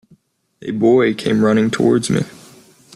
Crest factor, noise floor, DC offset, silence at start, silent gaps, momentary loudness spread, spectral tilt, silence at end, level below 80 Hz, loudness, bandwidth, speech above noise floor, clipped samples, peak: 14 dB; -55 dBFS; under 0.1%; 0.6 s; none; 13 LU; -6 dB/octave; 0.65 s; -54 dBFS; -16 LUFS; 12.5 kHz; 40 dB; under 0.1%; -4 dBFS